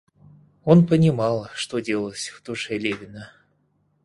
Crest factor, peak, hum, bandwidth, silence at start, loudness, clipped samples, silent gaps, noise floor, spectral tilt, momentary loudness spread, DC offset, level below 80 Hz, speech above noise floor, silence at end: 22 dB; -2 dBFS; none; 11.5 kHz; 0.65 s; -22 LUFS; under 0.1%; none; -66 dBFS; -6.5 dB/octave; 16 LU; under 0.1%; -56 dBFS; 45 dB; 0.8 s